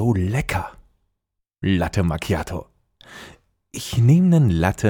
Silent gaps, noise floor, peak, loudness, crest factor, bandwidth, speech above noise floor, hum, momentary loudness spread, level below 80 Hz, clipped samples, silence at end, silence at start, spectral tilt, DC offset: none; -79 dBFS; -4 dBFS; -20 LUFS; 16 dB; 18 kHz; 60 dB; none; 21 LU; -42 dBFS; under 0.1%; 0 s; 0 s; -7 dB/octave; under 0.1%